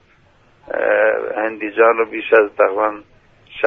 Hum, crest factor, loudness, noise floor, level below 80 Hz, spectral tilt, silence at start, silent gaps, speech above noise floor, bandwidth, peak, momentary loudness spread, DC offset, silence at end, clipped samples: none; 18 dB; -16 LUFS; -53 dBFS; -58 dBFS; -6.5 dB/octave; 0.7 s; none; 37 dB; 3.9 kHz; 0 dBFS; 10 LU; under 0.1%; 0 s; under 0.1%